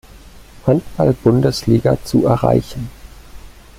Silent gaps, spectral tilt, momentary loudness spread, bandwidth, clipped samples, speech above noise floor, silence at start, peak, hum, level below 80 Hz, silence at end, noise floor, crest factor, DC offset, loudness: none; -7.5 dB/octave; 12 LU; 15.5 kHz; under 0.1%; 25 dB; 0.15 s; -2 dBFS; none; -38 dBFS; 0.25 s; -40 dBFS; 16 dB; under 0.1%; -16 LUFS